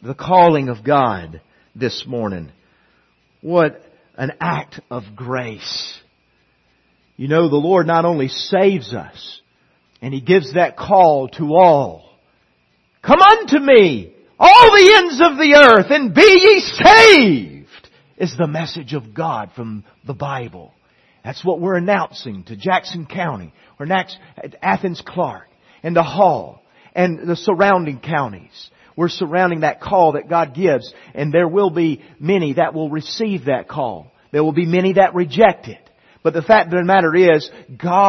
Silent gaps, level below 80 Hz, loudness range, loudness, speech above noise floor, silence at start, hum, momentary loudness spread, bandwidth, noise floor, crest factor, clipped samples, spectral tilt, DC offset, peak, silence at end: none; -50 dBFS; 15 LU; -13 LUFS; 47 dB; 0.05 s; none; 21 LU; 12 kHz; -61 dBFS; 14 dB; 0.1%; -5 dB/octave; under 0.1%; 0 dBFS; 0 s